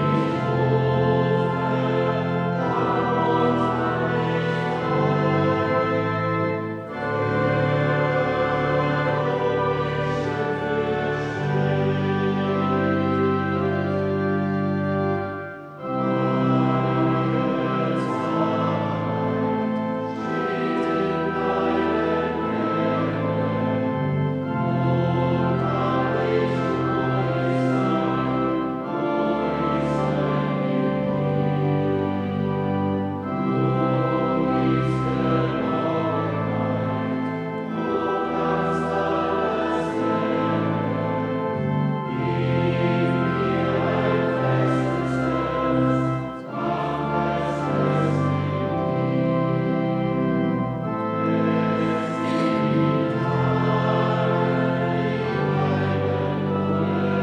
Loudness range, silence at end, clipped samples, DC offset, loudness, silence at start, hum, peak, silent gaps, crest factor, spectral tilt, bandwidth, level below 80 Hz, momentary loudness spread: 2 LU; 0 s; under 0.1%; under 0.1%; -23 LUFS; 0 s; none; -8 dBFS; none; 14 dB; -8.5 dB/octave; 8.8 kHz; -50 dBFS; 4 LU